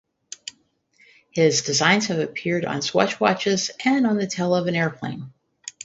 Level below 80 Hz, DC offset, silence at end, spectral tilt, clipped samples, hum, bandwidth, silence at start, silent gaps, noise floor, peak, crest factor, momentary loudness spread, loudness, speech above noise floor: -64 dBFS; under 0.1%; 0.15 s; -4 dB/octave; under 0.1%; none; 8 kHz; 0.45 s; none; -62 dBFS; 0 dBFS; 22 dB; 19 LU; -21 LUFS; 41 dB